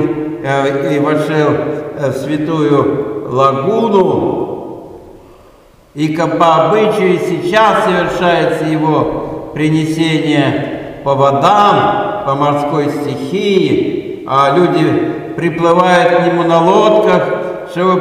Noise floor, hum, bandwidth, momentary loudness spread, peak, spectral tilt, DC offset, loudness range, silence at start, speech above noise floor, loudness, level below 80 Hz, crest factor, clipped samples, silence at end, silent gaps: -43 dBFS; none; 15 kHz; 10 LU; 0 dBFS; -6.5 dB/octave; under 0.1%; 3 LU; 0 s; 32 dB; -12 LUFS; -46 dBFS; 12 dB; under 0.1%; 0 s; none